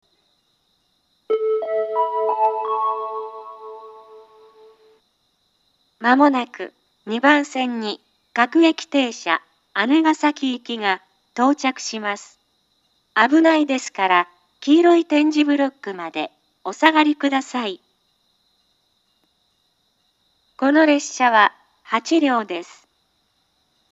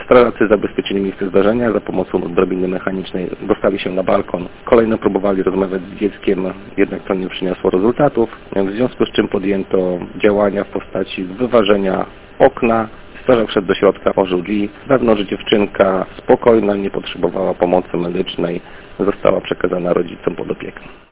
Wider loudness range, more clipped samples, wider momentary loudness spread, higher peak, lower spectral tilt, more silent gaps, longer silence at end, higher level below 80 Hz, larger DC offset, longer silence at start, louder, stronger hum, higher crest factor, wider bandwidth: first, 7 LU vs 3 LU; second, under 0.1% vs 0.2%; first, 16 LU vs 9 LU; about the same, 0 dBFS vs 0 dBFS; second, -3 dB/octave vs -10.5 dB/octave; neither; first, 1.3 s vs 0.15 s; second, -82 dBFS vs -42 dBFS; neither; first, 1.3 s vs 0 s; second, -19 LUFS vs -16 LUFS; neither; about the same, 20 dB vs 16 dB; first, 8 kHz vs 4 kHz